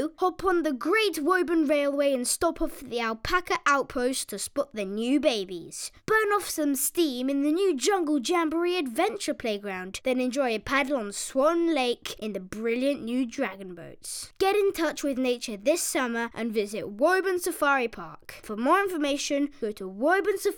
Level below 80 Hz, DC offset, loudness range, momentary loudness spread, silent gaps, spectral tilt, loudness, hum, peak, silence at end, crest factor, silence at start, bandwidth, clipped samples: -54 dBFS; under 0.1%; 3 LU; 10 LU; none; -3 dB/octave; -27 LUFS; none; -8 dBFS; 0 s; 18 dB; 0 s; over 20 kHz; under 0.1%